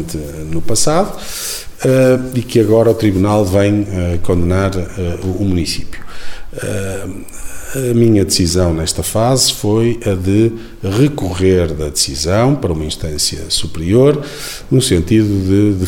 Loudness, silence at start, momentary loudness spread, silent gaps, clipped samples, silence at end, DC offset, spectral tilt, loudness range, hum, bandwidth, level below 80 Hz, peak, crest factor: -14 LUFS; 0 s; 13 LU; none; under 0.1%; 0 s; under 0.1%; -5 dB/octave; 5 LU; none; 18 kHz; -32 dBFS; 0 dBFS; 14 dB